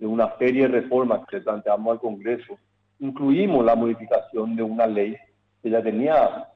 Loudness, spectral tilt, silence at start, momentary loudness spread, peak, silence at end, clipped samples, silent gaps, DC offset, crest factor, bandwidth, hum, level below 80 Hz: -22 LUFS; -9 dB/octave; 0 s; 10 LU; -8 dBFS; 0.1 s; under 0.1%; none; under 0.1%; 14 dB; 5.4 kHz; none; -60 dBFS